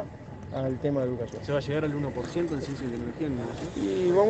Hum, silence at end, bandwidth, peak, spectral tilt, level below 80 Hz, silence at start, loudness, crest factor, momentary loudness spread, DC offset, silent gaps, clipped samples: none; 0 s; 8.6 kHz; -10 dBFS; -7.5 dB/octave; -52 dBFS; 0 s; -30 LUFS; 18 dB; 6 LU; under 0.1%; none; under 0.1%